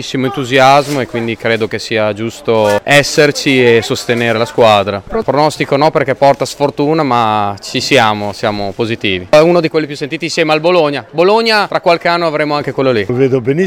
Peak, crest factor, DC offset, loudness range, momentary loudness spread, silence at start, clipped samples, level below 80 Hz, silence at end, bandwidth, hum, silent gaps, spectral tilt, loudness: 0 dBFS; 12 dB; under 0.1%; 2 LU; 8 LU; 0 s; 0.4%; -46 dBFS; 0 s; 17 kHz; none; none; -5 dB/octave; -12 LUFS